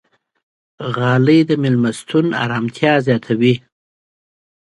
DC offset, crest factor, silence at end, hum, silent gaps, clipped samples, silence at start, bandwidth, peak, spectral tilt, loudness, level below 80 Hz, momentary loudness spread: under 0.1%; 18 dB; 1.15 s; none; none; under 0.1%; 0.8 s; 11.5 kHz; 0 dBFS; -7 dB/octave; -16 LUFS; -58 dBFS; 8 LU